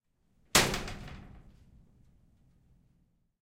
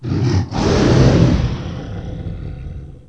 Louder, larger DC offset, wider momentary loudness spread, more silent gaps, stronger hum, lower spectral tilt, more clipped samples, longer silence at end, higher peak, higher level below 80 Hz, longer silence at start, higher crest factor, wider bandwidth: second, -28 LUFS vs -15 LUFS; second, under 0.1% vs 0.4%; first, 23 LU vs 18 LU; neither; neither; second, -2 dB/octave vs -7 dB/octave; neither; first, 2 s vs 0.15 s; second, -8 dBFS vs 0 dBFS; second, -50 dBFS vs -26 dBFS; first, 0.55 s vs 0 s; first, 28 dB vs 16 dB; first, 16 kHz vs 8.4 kHz